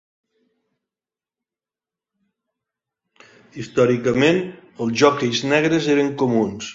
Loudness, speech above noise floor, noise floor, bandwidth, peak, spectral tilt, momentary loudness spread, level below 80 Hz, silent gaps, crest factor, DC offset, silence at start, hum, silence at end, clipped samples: -19 LUFS; over 72 dB; under -90 dBFS; 7.8 kHz; -2 dBFS; -5 dB/octave; 9 LU; -60 dBFS; none; 20 dB; under 0.1%; 3.55 s; none; 0 s; under 0.1%